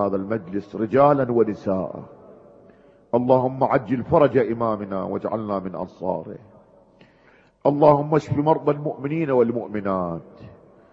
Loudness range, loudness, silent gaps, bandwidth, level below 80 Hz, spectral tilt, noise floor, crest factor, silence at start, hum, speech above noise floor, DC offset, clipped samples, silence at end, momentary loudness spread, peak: 3 LU; -22 LUFS; none; 7.4 kHz; -56 dBFS; -9.5 dB/octave; -56 dBFS; 22 dB; 0 s; none; 34 dB; under 0.1%; under 0.1%; 0.45 s; 13 LU; 0 dBFS